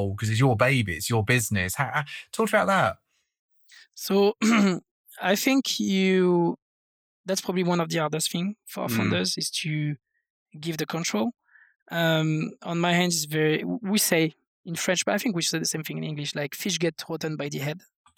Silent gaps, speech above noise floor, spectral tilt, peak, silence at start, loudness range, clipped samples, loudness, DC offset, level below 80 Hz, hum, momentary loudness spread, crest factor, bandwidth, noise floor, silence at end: 3.39-3.49 s, 4.91-5.05 s, 6.62-7.24 s, 10.30-10.46 s, 11.82-11.86 s, 14.47-14.64 s; over 65 dB; -4.5 dB/octave; -4 dBFS; 0 s; 4 LU; under 0.1%; -25 LUFS; under 0.1%; -62 dBFS; none; 11 LU; 22 dB; 19.5 kHz; under -90 dBFS; 0.4 s